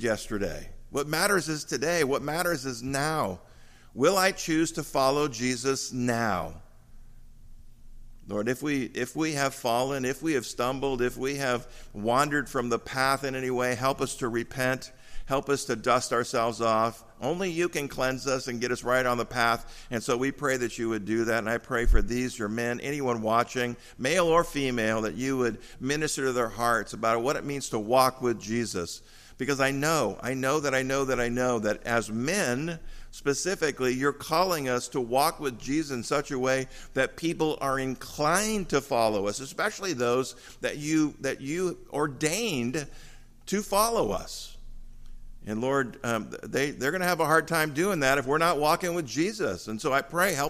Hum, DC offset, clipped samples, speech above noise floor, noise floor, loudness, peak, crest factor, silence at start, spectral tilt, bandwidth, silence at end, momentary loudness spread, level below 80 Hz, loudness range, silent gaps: none; under 0.1%; under 0.1%; 20 dB; -48 dBFS; -28 LUFS; -8 dBFS; 20 dB; 0 s; -4 dB/octave; 15.5 kHz; 0 s; 8 LU; -42 dBFS; 3 LU; none